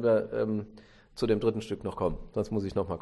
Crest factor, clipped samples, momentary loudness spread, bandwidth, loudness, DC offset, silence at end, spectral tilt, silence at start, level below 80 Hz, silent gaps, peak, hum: 16 dB; under 0.1%; 9 LU; 12 kHz; -31 LUFS; under 0.1%; 0 s; -7.5 dB/octave; 0 s; -50 dBFS; none; -14 dBFS; none